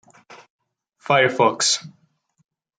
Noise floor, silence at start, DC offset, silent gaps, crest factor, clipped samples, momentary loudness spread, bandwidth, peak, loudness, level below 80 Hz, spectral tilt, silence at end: -65 dBFS; 0.3 s; under 0.1%; 0.50-0.59 s; 20 dB; under 0.1%; 8 LU; 10 kHz; -4 dBFS; -18 LUFS; -70 dBFS; -2.5 dB/octave; 0.9 s